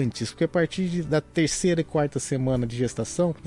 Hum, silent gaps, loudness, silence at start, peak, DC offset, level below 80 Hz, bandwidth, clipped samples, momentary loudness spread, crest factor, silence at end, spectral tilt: none; none; -25 LUFS; 0 s; -12 dBFS; under 0.1%; -48 dBFS; 11.5 kHz; under 0.1%; 4 LU; 14 dB; 0 s; -5.5 dB/octave